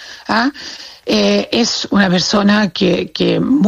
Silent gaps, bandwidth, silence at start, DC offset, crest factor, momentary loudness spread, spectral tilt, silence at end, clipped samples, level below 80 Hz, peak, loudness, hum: none; 8.2 kHz; 0 s; under 0.1%; 14 dB; 7 LU; -4.5 dB/octave; 0 s; under 0.1%; -48 dBFS; 0 dBFS; -14 LUFS; none